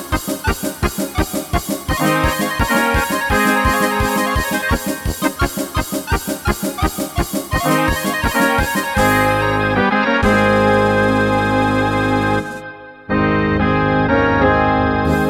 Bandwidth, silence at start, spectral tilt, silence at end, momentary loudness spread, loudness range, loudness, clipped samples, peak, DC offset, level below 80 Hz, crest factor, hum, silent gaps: over 20 kHz; 0 s; -5 dB/octave; 0 s; 7 LU; 5 LU; -16 LUFS; under 0.1%; 0 dBFS; under 0.1%; -28 dBFS; 16 dB; none; none